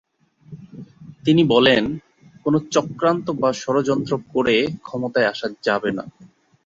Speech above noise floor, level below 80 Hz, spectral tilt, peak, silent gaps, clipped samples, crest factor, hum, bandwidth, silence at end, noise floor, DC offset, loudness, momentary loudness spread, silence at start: 26 dB; -56 dBFS; -5.5 dB/octave; -2 dBFS; none; under 0.1%; 20 dB; none; 7.8 kHz; 0.4 s; -45 dBFS; under 0.1%; -20 LUFS; 18 LU; 0.5 s